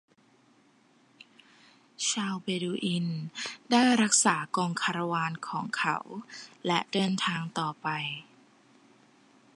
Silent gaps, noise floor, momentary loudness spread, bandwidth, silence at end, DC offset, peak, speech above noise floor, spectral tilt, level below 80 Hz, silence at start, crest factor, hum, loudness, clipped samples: none; -63 dBFS; 14 LU; 11.5 kHz; 1.35 s; under 0.1%; -10 dBFS; 34 dB; -3 dB/octave; -80 dBFS; 2 s; 22 dB; none; -29 LUFS; under 0.1%